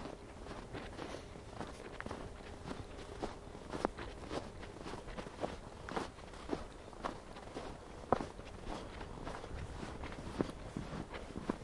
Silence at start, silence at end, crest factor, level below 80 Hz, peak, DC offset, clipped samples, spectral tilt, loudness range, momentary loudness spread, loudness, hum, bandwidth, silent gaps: 0 s; 0 s; 32 dB; -54 dBFS; -12 dBFS; under 0.1%; under 0.1%; -5.5 dB/octave; 3 LU; 8 LU; -46 LUFS; none; 11.5 kHz; none